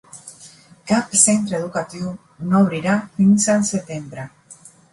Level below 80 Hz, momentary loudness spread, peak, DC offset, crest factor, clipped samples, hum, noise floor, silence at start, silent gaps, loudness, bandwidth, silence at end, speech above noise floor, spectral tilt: -58 dBFS; 23 LU; -2 dBFS; under 0.1%; 18 dB; under 0.1%; none; -46 dBFS; 0.15 s; none; -18 LUFS; 11.5 kHz; 0.4 s; 28 dB; -4.5 dB/octave